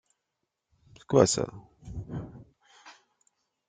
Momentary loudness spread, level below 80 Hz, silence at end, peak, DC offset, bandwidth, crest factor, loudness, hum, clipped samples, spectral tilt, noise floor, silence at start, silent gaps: 23 LU; -56 dBFS; 0.75 s; -6 dBFS; under 0.1%; 9.6 kHz; 26 dB; -27 LUFS; none; under 0.1%; -5 dB/octave; -84 dBFS; 1.1 s; none